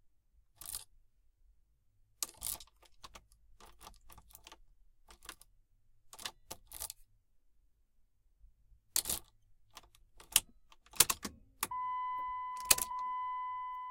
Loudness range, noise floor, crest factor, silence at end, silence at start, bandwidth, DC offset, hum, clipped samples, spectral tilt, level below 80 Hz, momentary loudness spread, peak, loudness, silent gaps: 19 LU; -71 dBFS; 34 dB; 0 s; 0.6 s; 17 kHz; under 0.1%; none; under 0.1%; 0.5 dB/octave; -64 dBFS; 27 LU; -6 dBFS; -35 LUFS; none